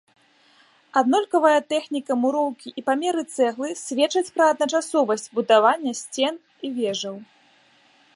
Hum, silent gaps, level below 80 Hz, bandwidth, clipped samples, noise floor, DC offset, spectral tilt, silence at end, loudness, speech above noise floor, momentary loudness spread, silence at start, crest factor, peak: none; none; -80 dBFS; 11.5 kHz; under 0.1%; -58 dBFS; under 0.1%; -3 dB/octave; 0.9 s; -22 LUFS; 36 dB; 10 LU; 0.95 s; 20 dB; -4 dBFS